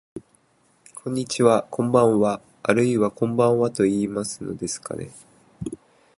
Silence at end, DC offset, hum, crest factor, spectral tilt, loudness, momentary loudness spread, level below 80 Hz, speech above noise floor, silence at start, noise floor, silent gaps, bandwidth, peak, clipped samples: 0.45 s; under 0.1%; none; 22 dB; -6 dB/octave; -22 LUFS; 17 LU; -58 dBFS; 41 dB; 0.15 s; -62 dBFS; none; 11.5 kHz; -2 dBFS; under 0.1%